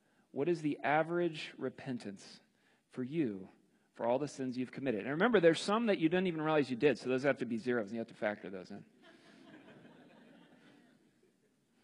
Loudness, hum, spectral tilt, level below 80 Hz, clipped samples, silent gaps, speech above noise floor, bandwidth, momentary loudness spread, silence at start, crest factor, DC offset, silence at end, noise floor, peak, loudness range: -35 LUFS; none; -6 dB/octave; -80 dBFS; under 0.1%; none; 39 dB; 11 kHz; 16 LU; 0.35 s; 22 dB; under 0.1%; 1.95 s; -74 dBFS; -14 dBFS; 11 LU